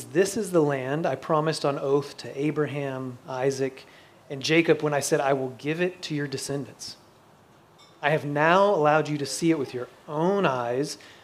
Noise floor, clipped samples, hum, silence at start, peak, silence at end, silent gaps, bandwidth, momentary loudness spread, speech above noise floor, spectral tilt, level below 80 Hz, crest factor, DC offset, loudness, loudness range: -55 dBFS; under 0.1%; none; 0 s; -4 dBFS; 0.1 s; none; 15.5 kHz; 12 LU; 30 dB; -5 dB/octave; -72 dBFS; 22 dB; under 0.1%; -25 LUFS; 5 LU